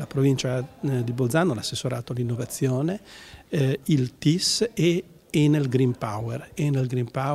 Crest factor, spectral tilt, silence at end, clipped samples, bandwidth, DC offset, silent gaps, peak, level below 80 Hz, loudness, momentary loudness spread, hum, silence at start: 18 dB; -5.5 dB/octave; 0 s; under 0.1%; 15 kHz; under 0.1%; none; -6 dBFS; -56 dBFS; -25 LUFS; 8 LU; none; 0 s